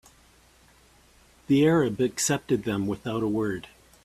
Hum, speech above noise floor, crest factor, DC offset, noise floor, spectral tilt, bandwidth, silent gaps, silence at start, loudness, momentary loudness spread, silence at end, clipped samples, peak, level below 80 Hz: none; 33 dB; 18 dB; under 0.1%; -58 dBFS; -5 dB/octave; 15 kHz; none; 1.5 s; -25 LUFS; 8 LU; 0.45 s; under 0.1%; -10 dBFS; -58 dBFS